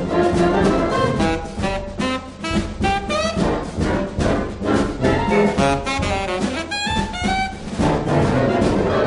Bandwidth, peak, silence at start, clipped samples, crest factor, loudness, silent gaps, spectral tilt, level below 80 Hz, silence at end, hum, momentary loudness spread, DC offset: 10.5 kHz; -2 dBFS; 0 s; under 0.1%; 16 dB; -20 LUFS; none; -6 dB/octave; -32 dBFS; 0 s; none; 7 LU; under 0.1%